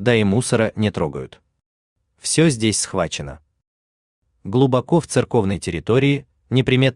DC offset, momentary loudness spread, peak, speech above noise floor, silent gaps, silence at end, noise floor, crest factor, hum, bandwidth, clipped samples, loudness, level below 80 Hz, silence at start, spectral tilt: under 0.1%; 12 LU; -2 dBFS; over 72 dB; 1.66-1.96 s, 3.67-4.22 s; 0.05 s; under -90 dBFS; 18 dB; none; 12.5 kHz; under 0.1%; -19 LUFS; -48 dBFS; 0 s; -5 dB/octave